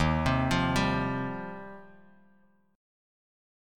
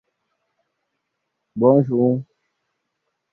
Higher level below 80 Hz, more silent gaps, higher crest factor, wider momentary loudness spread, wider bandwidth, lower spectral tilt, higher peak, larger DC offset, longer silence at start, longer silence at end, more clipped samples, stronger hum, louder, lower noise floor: first, -44 dBFS vs -66 dBFS; neither; about the same, 18 dB vs 20 dB; first, 19 LU vs 12 LU; first, 16.5 kHz vs 2 kHz; second, -6 dB/octave vs -13.5 dB/octave; second, -14 dBFS vs -2 dBFS; neither; second, 0 s vs 1.55 s; about the same, 1 s vs 1.1 s; neither; neither; second, -28 LUFS vs -18 LUFS; second, -65 dBFS vs -77 dBFS